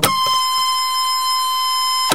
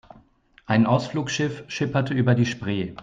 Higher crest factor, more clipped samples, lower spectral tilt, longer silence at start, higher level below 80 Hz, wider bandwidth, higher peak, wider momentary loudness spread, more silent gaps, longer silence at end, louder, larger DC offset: about the same, 18 dB vs 16 dB; neither; second, -0.5 dB/octave vs -6 dB/octave; second, 0 s vs 0.7 s; about the same, -56 dBFS vs -56 dBFS; first, 16 kHz vs 7.6 kHz; first, 0 dBFS vs -6 dBFS; second, 1 LU vs 8 LU; neither; about the same, 0 s vs 0 s; first, -16 LUFS vs -23 LUFS; first, 1% vs under 0.1%